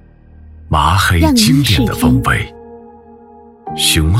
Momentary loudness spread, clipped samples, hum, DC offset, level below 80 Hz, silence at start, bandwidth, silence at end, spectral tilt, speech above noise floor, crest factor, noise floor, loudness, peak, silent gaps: 12 LU; under 0.1%; none; under 0.1%; -28 dBFS; 0.6 s; 16.5 kHz; 0 s; -4.5 dB/octave; 28 dB; 14 dB; -40 dBFS; -12 LUFS; 0 dBFS; none